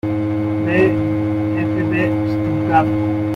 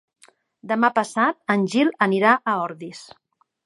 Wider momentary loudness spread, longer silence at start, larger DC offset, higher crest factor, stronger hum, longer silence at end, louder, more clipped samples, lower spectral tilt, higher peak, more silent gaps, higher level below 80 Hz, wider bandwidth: second, 4 LU vs 15 LU; second, 0.05 s vs 0.65 s; neither; second, 14 dB vs 20 dB; neither; second, 0 s vs 0.6 s; about the same, -18 LUFS vs -20 LUFS; neither; first, -9 dB/octave vs -5.5 dB/octave; about the same, -2 dBFS vs -2 dBFS; neither; first, -44 dBFS vs -76 dBFS; second, 6 kHz vs 11.5 kHz